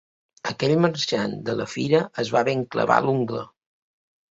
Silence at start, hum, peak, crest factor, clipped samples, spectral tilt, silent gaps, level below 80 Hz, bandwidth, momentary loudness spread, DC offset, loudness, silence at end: 0.45 s; none; -2 dBFS; 22 dB; under 0.1%; -5.5 dB/octave; none; -62 dBFS; 8 kHz; 11 LU; under 0.1%; -23 LUFS; 0.85 s